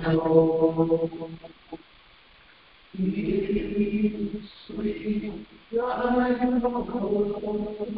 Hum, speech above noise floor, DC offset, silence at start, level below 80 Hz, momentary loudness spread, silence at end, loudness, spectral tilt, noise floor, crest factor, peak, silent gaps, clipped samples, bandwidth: none; 29 dB; under 0.1%; 0 s; -50 dBFS; 19 LU; 0 s; -26 LUFS; -11.5 dB/octave; -55 dBFS; 20 dB; -6 dBFS; none; under 0.1%; 5 kHz